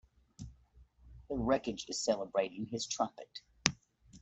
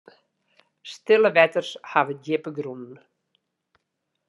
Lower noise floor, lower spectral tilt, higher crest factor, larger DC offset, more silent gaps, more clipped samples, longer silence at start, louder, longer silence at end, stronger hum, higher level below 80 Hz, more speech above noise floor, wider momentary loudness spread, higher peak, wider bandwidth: second, -63 dBFS vs -79 dBFS; second, -3.5 dB/octave vs -5 dB/octave; first, 36 dB vs 24 dB; neither; neither; neither; second, 0.4 s vs 0.85 s; second, -36 LUFS vs -22 LUFS; second, 0.05 s vs 1.35 s; neither; first, -58 dBFS vs -86 dBFS; second, 28 dB vs 56 dB; second, 19 LU vs 23 LU; about the same, -2 dBFS vs -2 dBFS; second, 8.2 kHz vs 11 kHz